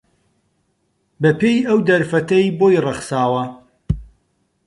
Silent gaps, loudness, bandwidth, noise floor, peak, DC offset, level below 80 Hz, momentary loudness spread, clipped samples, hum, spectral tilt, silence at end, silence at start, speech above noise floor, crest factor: none; -17 LUFS; 11.5 kHz; -66 dBFS; -4 dBFS; under 0.1%; -40 dBFS; 11 LU; under 0.1%; none; -6.5 dB/octave; 0.6 s; 1.2 s; 51 dB; 16 dB